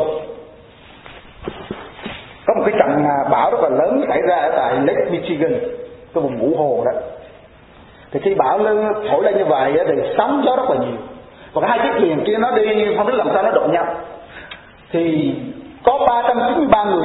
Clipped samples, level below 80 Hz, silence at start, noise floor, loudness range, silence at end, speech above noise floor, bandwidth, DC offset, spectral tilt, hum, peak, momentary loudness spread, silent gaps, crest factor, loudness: under 0.1%; -50 dBFS; 0 s; -44 dBFS; 4 LU; 0 s; 28 dB; 4.1 kHz; under 0.1%; -10 dB/octave; none; 0 dBFS; 17 LU; none; 18 dB; -17 LUFS